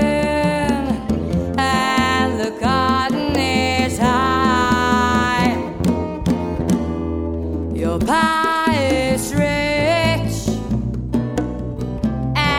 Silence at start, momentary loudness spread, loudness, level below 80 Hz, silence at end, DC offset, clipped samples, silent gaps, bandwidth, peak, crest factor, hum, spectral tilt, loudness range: 0 s; 7 LU; -18 LUFS; -32 dBFS; 0 s; 0.2%; under 0.1%; none; 17 kHz; -2 dBFS; 16 dB; none; -5.5 dB/octave; 3 LU